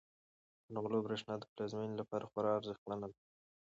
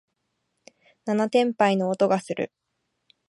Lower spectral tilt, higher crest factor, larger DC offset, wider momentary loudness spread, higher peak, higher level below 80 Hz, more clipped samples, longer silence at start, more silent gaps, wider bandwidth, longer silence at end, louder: about the same, -5.5 dB/octave vs -6 dB/octave; about the same, 18 dB vs 20 dB; neither; second, 8 LU vs 11 LU; second, -24 dBFS vs -6 dBFS; about the same, -78 dBFS vs -74 dBFS; neither; second, 0.7 s vs 1.05 s; first, 1.49-1.56 s, 2.78-2.86 s vs none; second, 8 kHz vs 11.5 kHz; second, 0.5 s vs 0.85 s; second, -41 LUFS vs -24 LUFS